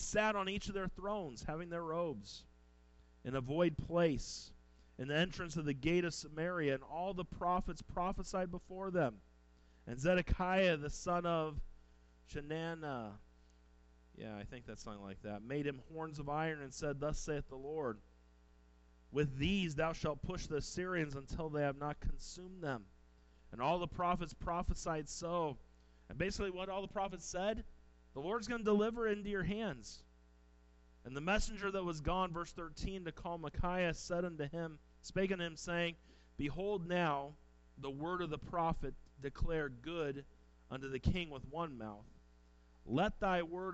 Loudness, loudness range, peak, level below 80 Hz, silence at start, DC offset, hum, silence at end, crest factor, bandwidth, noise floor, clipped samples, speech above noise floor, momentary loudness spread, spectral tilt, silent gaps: -40 LUFS; 5 LU; -20 dBFS; -52 dBFS; 0 s; under 0.1%; none; 0 s; 20 dB; 8.2 kHz; -66 dBFS; under 0.1%; 27 dB; 14 LU; -5.5 dB/octave; none